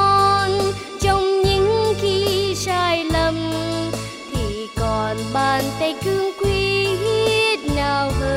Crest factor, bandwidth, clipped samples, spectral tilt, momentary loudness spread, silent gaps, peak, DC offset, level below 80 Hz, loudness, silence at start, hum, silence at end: 14 dB; 16 kHz; under 0.1%; -4.5 dB/octave; 7 LU; none; -6 dBFS; under 0.1%; -34 dBFS; -19 LUFS; 0 s; none; 0 s